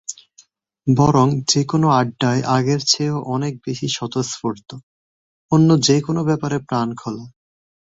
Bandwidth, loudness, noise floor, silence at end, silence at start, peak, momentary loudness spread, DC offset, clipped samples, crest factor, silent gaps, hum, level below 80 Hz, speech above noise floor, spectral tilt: 8 kHz; -18 LUFS; -54 dBFS; 0.6 s; 0.1 s; -2 dBFS; 14 LU; under 0.1%; under 0.1%; 18 dB; 4.83-5.49 s; none; -54 dBFS; 36 dB; -5 dB/octave